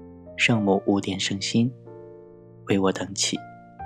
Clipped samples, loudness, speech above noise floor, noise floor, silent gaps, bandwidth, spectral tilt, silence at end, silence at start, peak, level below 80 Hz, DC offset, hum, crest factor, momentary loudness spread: under 0.1%; -24 LUFS; 23 dB; -47 dBFS; none; 12.5 kHz; -4 dB/octave; 0 s; 0 s; -6 dBFS; -64 dBFS; under 0.1%; none; 20 dB; 22 LU